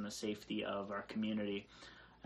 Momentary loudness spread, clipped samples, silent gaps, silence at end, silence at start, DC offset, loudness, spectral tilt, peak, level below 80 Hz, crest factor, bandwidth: 17 LU; under 0.1%; none; 0 s; 0 s; under 0.1%; -42 LUFS; -4.5 dB/octave; -28 dBFS; -72 dBFS; 14 dB; 13 kHz